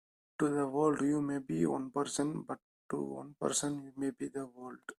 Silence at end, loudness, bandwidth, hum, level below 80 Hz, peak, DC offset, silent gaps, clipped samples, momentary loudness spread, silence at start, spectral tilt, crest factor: 0.05 s; -35 LUFS; 14 kHz; none; -72 dBFS; -16 dBFS; under 0.1%; 2.62-2.89 s; under 0.1%; 13 LU; 0.4 s; -5 dB/octave; 18 dB